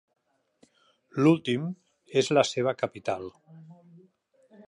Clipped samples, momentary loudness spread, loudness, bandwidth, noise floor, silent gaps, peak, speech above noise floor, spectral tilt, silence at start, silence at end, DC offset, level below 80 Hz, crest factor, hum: under 0.1%; 14 LU; -27 LUFS; 11.5 kHz; -65 dBFS; none; -8 dBFS; 39 dB; -5.5 dB/octave; 1.15 s; 0.95 s; under 0.1%; -72 dBFS; 22 dB; none